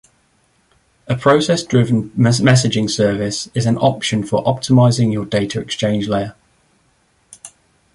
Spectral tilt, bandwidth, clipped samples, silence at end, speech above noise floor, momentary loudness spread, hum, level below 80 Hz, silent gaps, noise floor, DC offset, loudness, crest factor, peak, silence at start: -5.5 dB/octave; 11.5 kHz; under 0.1%; 0.45 s; 44 dB; 8 LU; none; -48 dBFS; none; -59 dBFS; under 0.1%; -16 LUFS; 16 dB; -2 dBFS; 1.1 s